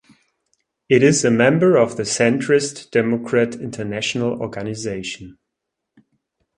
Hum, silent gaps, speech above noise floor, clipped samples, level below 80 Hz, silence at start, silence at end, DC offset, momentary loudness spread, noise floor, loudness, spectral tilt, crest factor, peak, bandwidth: none; none; 62 dB; under 0.1%; -56 dBFS; 0.9 s; 1.25 s; under 0.1%; 12 LU; -80 dBFS; -18 LUFS; -5 dB/octave; 18 dB; 0 dBFS; 11.5 kHz